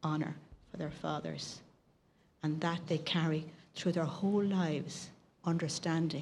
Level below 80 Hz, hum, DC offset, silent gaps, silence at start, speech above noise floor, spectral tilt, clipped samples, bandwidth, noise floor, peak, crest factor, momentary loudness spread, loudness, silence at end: -70 dBFS; none; under 0.1%; none; 0 s; 35 dB; -5.5 dB/octave; under 0.1%; 11.5 kHz; -69 dBFS; -20 dBFS; 16 dB; 13 LU; -36 LUFS; 0 s